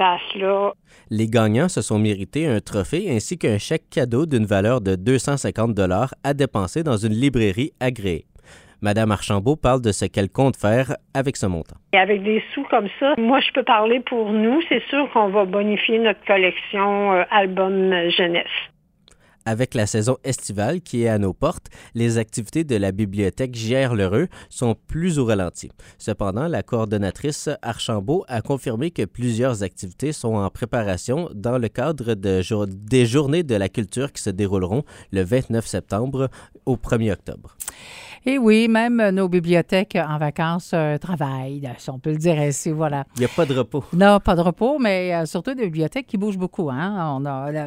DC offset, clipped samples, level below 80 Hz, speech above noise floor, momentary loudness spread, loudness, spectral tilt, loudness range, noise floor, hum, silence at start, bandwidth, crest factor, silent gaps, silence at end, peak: under 0.1%; under 0.1%; -46 dBFS; 35 dB; 9 LU; -21 LUFS; -5.5 dB/octave; 5 LU; -56 dBFS; none; 0 s; 16 kHz; 20 dB; none; 0 s; 0 dBFS